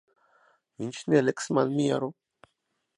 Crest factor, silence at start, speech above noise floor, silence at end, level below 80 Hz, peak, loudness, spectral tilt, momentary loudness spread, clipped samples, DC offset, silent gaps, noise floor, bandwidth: 20 dB; 0.8 s; 52 dB; 0.85 s; -74 dBFS; -8 dBFS; -27 LUFS; -6 dB/octave; 13 LU; under 0.1%; under 0.1%; none; -78 dBFS; 11.5 kHz